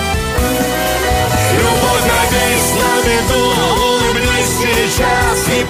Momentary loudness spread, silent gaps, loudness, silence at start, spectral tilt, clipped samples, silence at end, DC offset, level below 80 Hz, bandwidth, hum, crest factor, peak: 3 LU; none; -13 LUFS; 0 s; -3.5 dB/octave; under 0.1%; 0 s; under 0.1%; -24 dBFS; 15.5 kHz; none; 12 dB; -2 dBFS